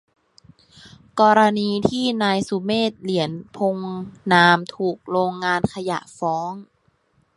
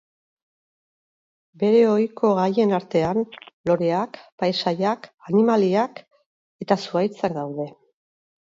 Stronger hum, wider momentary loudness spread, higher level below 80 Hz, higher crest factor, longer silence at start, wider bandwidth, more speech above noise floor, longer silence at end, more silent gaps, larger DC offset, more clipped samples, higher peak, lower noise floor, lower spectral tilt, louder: neither; about the same, 13 LU vs 13 LU; first, -56 dBFS vs -64 dBFS; about the same, 20 dB vs 20 dB; second, 0.85 s vs 1.6 s; first, 11.5 kHz vs 7.6 kHz; second, 43 dB vs over 69 dB; second, 0.7 s vs 0.85 s; second, none vs 3.53-3.64 s, 4.32-4.38 s, 5.14-5.18 s, 6.26-6.59 s; neither; neither; first, 0 dBFS vs -4 dBFS; second, -63 dBFS vs under -90 dBFS; second, -5.5 dB/octave vs -7 dB/octave; about the same, -20 LUFS vs -22 LUFS